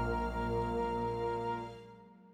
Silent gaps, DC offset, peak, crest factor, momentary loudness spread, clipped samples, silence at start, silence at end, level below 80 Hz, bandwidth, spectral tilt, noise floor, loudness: none; under 0.1%; -22 dBFS; 14 dB; 13 LU; under 0.1%; 0 s; 0 s; -46 dBFS; 12 kHz; -7.5 dB/octave; -56 dBFS; -36 LUFS